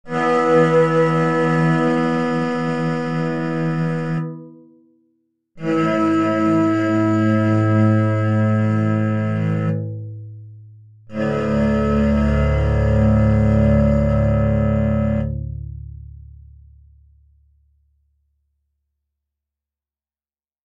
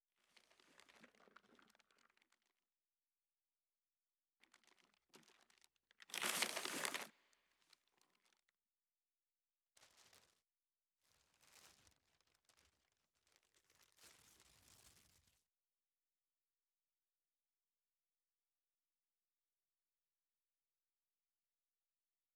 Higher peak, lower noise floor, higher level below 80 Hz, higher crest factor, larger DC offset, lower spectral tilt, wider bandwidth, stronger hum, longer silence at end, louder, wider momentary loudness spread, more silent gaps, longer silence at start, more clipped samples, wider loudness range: first, -4 dBFS vs -20 dBFS; about the same, under -90 dBFS vs under -90 dBFS; first, -30 dBFS vs under -90 dBFS; second, 16 dB vs 40 dB; neither; first, -8.5 dB/octave vs 0 dB/octave; second, 8.6 kHz vs 19.5 kHz; neither; second, 4.05 s vs 7.45 s; first, -18 LUFS vs -44 LUFS; second, 14 LU vs 28 LU; neither; second, 0.05 s vs 0.9 s; neither; about the same, 7 LU vs 6 LU